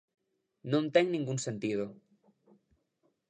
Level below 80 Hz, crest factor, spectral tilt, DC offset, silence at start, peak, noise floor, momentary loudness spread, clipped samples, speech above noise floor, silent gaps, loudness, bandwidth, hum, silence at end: -76 dBFS; 22 dB; -5.5 dB/octave; under 0.1%; 0.65 s; -12 dBFS; -77 dBFS; 12 LU; under 0.1%; 46 dB; none; -32 LUFS; 9.8 kHz; none; 1.35 s